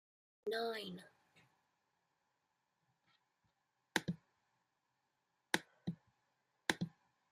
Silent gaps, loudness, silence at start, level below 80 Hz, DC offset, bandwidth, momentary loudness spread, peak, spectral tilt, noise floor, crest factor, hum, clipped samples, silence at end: none; -43 LUFS; 0.45 s; -84 dBFS; under 0.1%; 15 kHz; 11 LU; -14 dBFS; -4 dB/octave; -86 dBFS; 34 dB; none; under 0.1%; 0.4 s